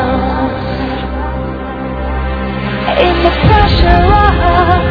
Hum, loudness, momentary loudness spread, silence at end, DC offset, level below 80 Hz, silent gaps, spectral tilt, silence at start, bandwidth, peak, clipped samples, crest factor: none; -12 LUFS; 11 LU; 0 s; under 0.1%; -18 dBFS; none; -8.5 dB/octave; 0 s; 5.4 kHz; 0 dBFS; 0.7%; 12 dB